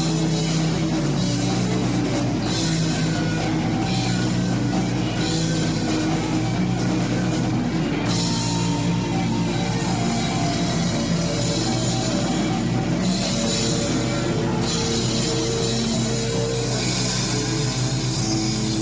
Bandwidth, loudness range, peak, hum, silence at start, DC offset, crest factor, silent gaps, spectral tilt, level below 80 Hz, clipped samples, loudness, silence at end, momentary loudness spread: 8 kHz; 1 LU; -8 dBFS; 50 Hz at -35 dBFS; 0 s; under 0.1%; 14 dB; none; -5 dB/octave; -38 dBFS; under 0.1%; -22 LUFS; 0 s; 1 LU